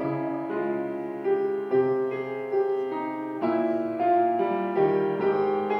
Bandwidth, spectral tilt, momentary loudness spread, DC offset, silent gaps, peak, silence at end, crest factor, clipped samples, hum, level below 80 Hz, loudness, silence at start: 5.4 kHz; -9 dB/octave; 7 LU; under 0.1%; none; -12 dBFS; 0 s; 14 dB; under 0.1%; none; -78 dBFS; -26 LUFS; 0 s